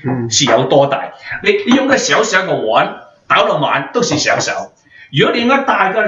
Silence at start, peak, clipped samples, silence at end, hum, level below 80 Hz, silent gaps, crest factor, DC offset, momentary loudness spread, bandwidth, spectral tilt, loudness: 0 s; 0 dBFS; under 0.1%; 0 s; none; -56 dBFS; none; 14 dB; under 0.1%; 9 LU; 8 kHz; -3.5 dB/octave; -13 LUFS